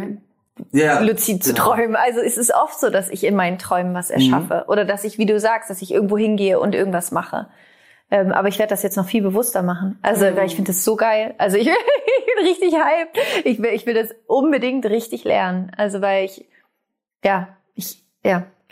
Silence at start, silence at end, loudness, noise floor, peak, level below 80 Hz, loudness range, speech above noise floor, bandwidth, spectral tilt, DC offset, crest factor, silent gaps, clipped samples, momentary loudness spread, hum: 0 s; 0.25 s; -18 LUFS; -77 dBFS; -2 dBFS; -64 dBFS; 3 LU; 59 dB; 16 kHz; -4.5 dB/octave; under 0.1%; 16 dB; none; under 0.1%; 7 LU; none